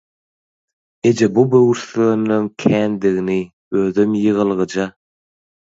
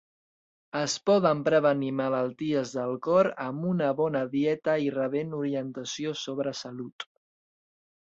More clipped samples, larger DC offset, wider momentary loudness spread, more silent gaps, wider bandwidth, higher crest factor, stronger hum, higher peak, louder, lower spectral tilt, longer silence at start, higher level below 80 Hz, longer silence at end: neither; neither; second, 8 LU vs 12 LU; first, 3.53-3.71 s vs 6.92-6.99 s; about the same, 7.8 kHz vs 8.2 kHz; about the same, 16 dB vs 18 dB; neither; first, 0 dBFS vs -10 dBFS; first, -17 LUFS vs -28 LUFS; first, -7 dB/octave vs -5.5 dB/octave; first, 1.05 s vs 0.75 s; first, -56 dBFS vs -72 dBFS; about the same, 0.9 s vs 1 s